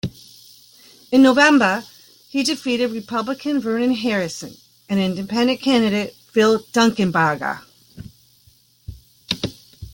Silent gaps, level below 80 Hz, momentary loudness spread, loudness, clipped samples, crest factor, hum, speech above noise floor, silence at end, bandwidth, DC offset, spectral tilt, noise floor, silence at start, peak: none; -52 dBFS; 13 LU; -19 LUFS; under 0.1%; 18 dB; none; 37 dB; 0 s; 17 kHz; under 0.1%; -4.5 dB/octave; -55 dBFS; 0.05 s; -2 dBFS